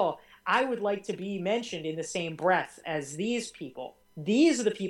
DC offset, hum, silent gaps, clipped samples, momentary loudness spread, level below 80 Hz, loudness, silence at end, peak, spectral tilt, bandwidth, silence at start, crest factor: under 0.1%; none; none; under 0.1%; 15 LU; -72 dBFS; -29 LUFS; 0 s; -12 dBFS; -4.5 dB/octave; 16.5 kHz; 0 s; 18 dB